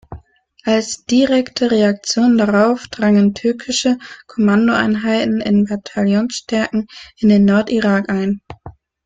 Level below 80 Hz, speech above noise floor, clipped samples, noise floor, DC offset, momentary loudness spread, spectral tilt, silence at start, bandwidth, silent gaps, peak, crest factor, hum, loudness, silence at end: -50 dBFS; 32 dB; under 0.1%; -47 dBFS; under 0.1%; 8 LU; -5.5 dB/octave; 0.1 s; 9.2 kHz; none; -2 dBFS; 14 dB; none; -16 LUFS; 0.35 s